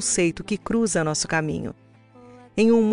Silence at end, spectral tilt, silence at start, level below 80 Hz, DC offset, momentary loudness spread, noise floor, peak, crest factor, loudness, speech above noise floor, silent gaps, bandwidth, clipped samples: 0 s; -4 dB/octave; 0 s; -50 dBFS; under 0.1%; 12 LU; -49 dBFS; -8 dBFS; 14 dB; -23 LUFS; 27 dB; none; 11 kHz; under 0.1%